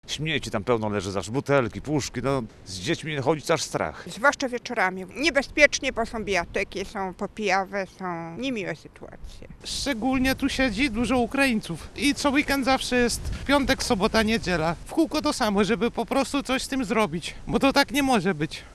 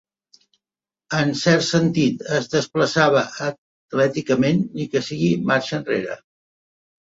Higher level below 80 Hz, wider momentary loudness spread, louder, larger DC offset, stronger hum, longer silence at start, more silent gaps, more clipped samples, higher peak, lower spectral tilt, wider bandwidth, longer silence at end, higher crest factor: first, -44 dBFS vs -58 dBFS; about the same, 10 LU vs 9 LU; second, -25 LUFS vs -20 LUFS; neither; neither; second, 0.05 s vs 1.1 s; second, none vs 3.58-3.89 s; neither; about the same, -2 dBFS vs -2 dBFS; second, -4 dB/octave vs -5.5 dB/octave; first, 14.5 kHz vs 8 kHz; second, 0 s vs 0.9 s; first, 24 dB vs 18 dB